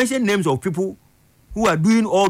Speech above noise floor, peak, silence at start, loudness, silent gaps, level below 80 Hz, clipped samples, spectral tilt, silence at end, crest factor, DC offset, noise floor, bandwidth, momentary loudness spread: 28 dB; -8 dBFS; 0 s; -19 LUFS; none; -48 dBFS; under 0.1%; -5.5 dB/octave; 0 s; 12 dB; under 0.1%; -46 dBFS; 16 kHz; 10 LU